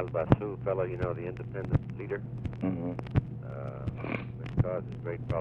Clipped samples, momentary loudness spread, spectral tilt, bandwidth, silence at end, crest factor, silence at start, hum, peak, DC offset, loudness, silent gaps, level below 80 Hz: under 0.1%; 10 LU; -10 dB/octave; 5.4 kHz; 0 s; 26 dB; 0 s; none; -6 dBFS; under 0.1%; -33 LUFS; none; -46 dBFS